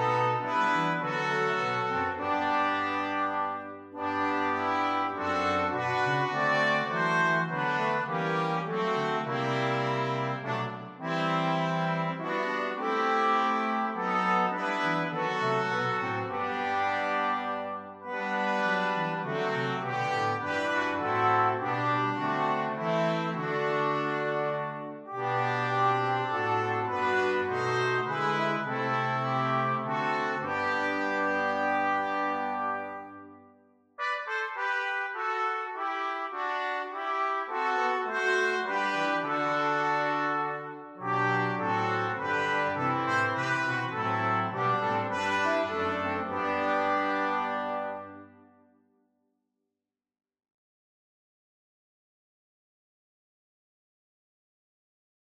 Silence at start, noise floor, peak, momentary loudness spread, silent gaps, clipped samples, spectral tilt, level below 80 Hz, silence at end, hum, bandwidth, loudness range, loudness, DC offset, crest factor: 0 s; -88 dBFS; -12 dBFS; 6 LU; none; under 0.1%; -5.5 dB/octave; -74 dBFS; 6.95 s; none; 12 kHz; 4 LU; -29 LUFS; under 0.1%; 16 dB